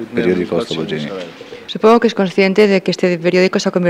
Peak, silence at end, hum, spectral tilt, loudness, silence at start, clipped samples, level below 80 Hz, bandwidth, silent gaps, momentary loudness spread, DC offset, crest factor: 0 dBFS; 0 s; none; -6 dB/octave; -14 LUFS; 0 s; under 0.1%; -58 dBFS; 11.5 kHz; none; 15 LU; under 0.1%; 14 dB